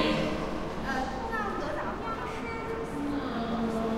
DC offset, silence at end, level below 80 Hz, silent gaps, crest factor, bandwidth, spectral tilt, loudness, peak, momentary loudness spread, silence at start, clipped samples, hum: under 0.1%; 0 s; -44 dBFS; none; 18 dB; 15.5 kHz; -5.5 dB/octave; -33 LUFS; -14 dBFS; 4 LU; 0 s; under 0.1%; none